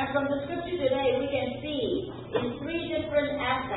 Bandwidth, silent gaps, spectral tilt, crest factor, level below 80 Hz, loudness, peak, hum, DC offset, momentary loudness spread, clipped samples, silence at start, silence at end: 4.1 kHz; none; -10 dB/octave; 16 dB; -52 dBFS; -29 LUFS; -12 dBFS; none; under 0.1%; 6 LU; under 0.1%; 0 s; 0 s